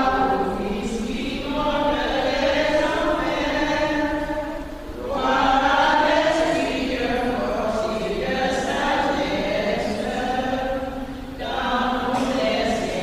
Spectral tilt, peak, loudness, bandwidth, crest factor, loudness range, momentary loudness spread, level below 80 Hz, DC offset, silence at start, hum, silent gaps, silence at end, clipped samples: -4.5 dB/octave; -6 dBFS; -22 LUFS; 15.5 kHz; 16 dB; 3 LU; 9 LU; -38 dBFS; under 0.1%; 0 s; none; none; 0 s; under 0.1%